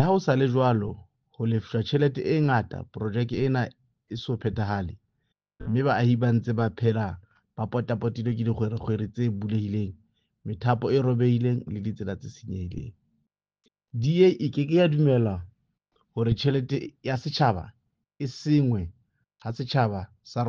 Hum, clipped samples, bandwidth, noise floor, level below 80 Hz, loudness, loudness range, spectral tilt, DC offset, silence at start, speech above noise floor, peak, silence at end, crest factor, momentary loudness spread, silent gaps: none; under 0.1%; 7 kHz; -77 dBFS; -54 dBFS; -26 LUFS; 4 LU; -8 dB/octave; under 0.1%; 0 s; 52 dB; -8 dBFS; 0 s; 18 dB; 15 LU; none